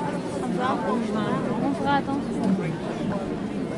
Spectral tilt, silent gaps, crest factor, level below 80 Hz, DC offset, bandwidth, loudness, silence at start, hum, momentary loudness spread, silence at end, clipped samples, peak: -7 dB/octave; none; 16 dB; -52 dBFS; under 0.1%; 11.5 kHz; -26 LUFS; 0 s; none; 5 LU; 0 s; under 0.1%; -10 dBFS